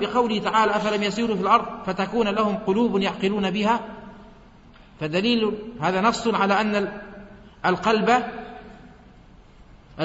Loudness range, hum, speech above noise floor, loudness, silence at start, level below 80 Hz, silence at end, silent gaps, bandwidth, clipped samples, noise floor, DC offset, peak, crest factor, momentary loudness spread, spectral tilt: 3 LU; none; 27 dB; -22 LUFS; 0 s; -52 dBFS; 0 s; none; 8 kHz; under 0.1%; -49 dBFS; under 0.1%; -6 dBFS; 18 dB; 15 LU; -5.5 dB/octave